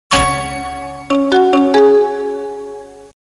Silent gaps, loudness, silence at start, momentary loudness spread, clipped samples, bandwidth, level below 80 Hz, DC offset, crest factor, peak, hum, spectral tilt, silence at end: none; -13 LUFS; 0.1 s; 18 LU; under 0.1%; 12.5 kHz; -36 dBFS; under 0.1%; 14 dB; 0 dBFS; 50 Hz at -55 dBFS; -4.5 dB/octave; 0.2 s